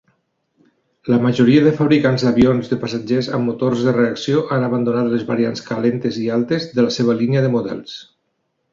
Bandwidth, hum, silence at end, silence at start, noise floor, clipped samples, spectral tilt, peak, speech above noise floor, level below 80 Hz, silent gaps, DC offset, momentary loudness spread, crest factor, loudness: 7.4 kHz; none; 0.7 s; 1.05 s; -70 dBFS; under 0.1%; -7 dB/octave; -2 dBFS; 54 dB; -50 dBFS; none; under 0.1%; 8 LU; 16 dB; -17 LUFS